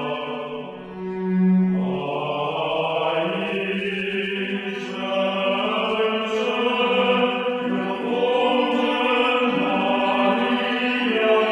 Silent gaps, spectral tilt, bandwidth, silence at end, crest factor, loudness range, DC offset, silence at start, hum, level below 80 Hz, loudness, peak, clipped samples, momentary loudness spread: none; -6.5 dB/octave; 9.6 kHz; 0 s; 16 dB; 4 LU; under 0.1%; 0 s; none; -62 dBFS; -22 LUFS; -6 dBFS; under 0.1%; 8 LU